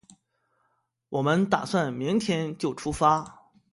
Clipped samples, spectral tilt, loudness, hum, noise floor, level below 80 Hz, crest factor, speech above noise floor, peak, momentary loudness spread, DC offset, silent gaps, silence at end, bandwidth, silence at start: under 0.1%; -6 dB/octave; -26 LUFS; none; -74 dBFS; -54 dBFS; 20 dB; 48 dB; -8 dBFS; 7 LU; under 0.1%; none; 0.4 s; 11.5 kHz; 1.1 s